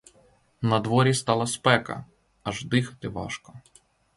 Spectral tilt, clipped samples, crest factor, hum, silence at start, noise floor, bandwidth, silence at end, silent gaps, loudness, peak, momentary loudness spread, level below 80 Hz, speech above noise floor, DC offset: -5 dB/octave; under 0.1%; 22 dB; none; 0.6 s; -61 dBFS; 11.5 kHz; 0.6 s; none; -25 LUFS; -6 dBFS; 15 LU; -56 dBFS; 36 dB; under 0.1%